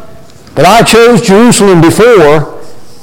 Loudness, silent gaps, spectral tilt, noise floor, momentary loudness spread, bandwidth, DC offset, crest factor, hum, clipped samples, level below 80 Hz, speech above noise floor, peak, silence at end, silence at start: -4 LUFS; none; -5 dB/octave; -32 dBFS; 7 LU; 17.5 kHz; under 0.1%; 6 dB; none; 0.5%; -32 dBFS; 29 dB; 0 dBFS; 0 s; 0 s